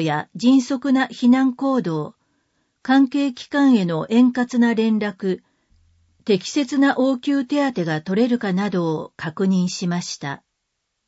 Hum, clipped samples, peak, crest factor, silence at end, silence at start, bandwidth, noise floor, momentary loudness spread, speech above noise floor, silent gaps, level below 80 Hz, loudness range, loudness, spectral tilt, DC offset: none; under 0.1%; -6 dBFS; 14 dB; 0.7 s; 0 s; 8 kHz; -76 dBFS; 11 LU; 57 dB; none; -66 dBFS; 3 LU; -20 LUFS; -6 dB/octave; under 0.1%